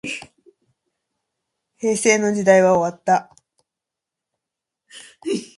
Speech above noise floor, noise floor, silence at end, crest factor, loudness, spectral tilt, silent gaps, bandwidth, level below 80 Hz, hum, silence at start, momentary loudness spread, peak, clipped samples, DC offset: 67 dB; -85 dBFS; 0.15 s; 22 dB; -18 LUFS; -4 dB/octave; none; 11.5 kHz; -64 dBFS; none; 0.05 s; 15 LU; 0 dBFS; under 0.1%; under 0.1%